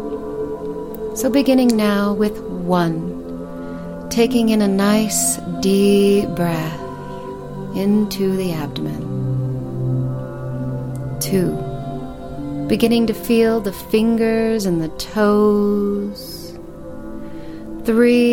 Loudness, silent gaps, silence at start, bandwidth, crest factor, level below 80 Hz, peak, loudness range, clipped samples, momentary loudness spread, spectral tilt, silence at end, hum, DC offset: -18 LUFS; none; 0 s; 17 kHz; 16 dB; -40 dBFS; -2 dBFS; 6 LU; under 0.1%; 16 LU; -5.5 dB/octave; 0 s; none; 0.2%